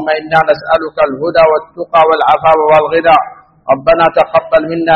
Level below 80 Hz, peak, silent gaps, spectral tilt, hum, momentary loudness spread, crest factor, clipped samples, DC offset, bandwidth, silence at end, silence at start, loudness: -42 dBFS; 0 dBFS; none; -6.5 dB/octave; none; 6 LU; 10 dB; 0.2%; under 0.1%; 5.8 kHz; 0 s; 0 s; -10 LUFS